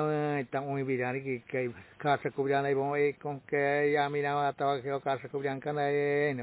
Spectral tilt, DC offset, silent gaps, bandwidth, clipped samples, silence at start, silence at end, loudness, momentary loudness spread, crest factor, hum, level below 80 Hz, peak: -5 dB/octave; under 0.1%; none; 4 kHz; under 0.1%; 0 s; 0 s; -31 LUFS; 7 LU; 16 dB; none; -72 dBFS; -14 dBFS